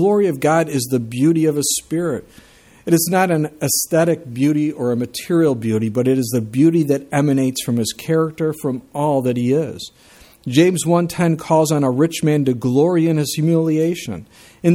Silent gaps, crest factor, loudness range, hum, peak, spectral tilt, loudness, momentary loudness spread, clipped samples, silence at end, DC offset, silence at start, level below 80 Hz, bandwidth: none; 16 dB; 2 LU; none; 0 dBFS; -5.5 dB/octave; -18 LUFS; 7 LU; under 0.1%; 0 s; under 0.1%; 0 s; -56 dBFS; 16.5 kHz